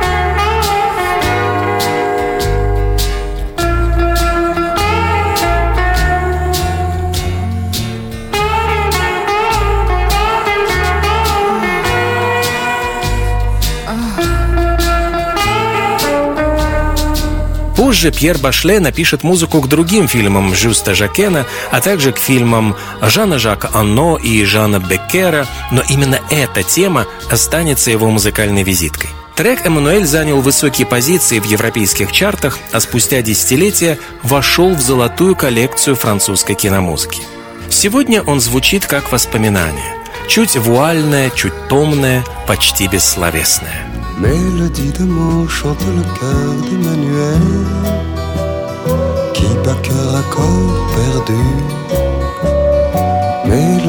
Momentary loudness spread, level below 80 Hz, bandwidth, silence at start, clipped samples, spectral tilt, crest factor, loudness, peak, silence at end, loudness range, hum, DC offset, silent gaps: 7 LU; -22 dBFS; 19 kHz; 0 s; under 0.1%; -4 dB/octave; 12 dB; -13 LUFS; 0 dBFS; 0 s; 4 LU; none; under 0.1%; none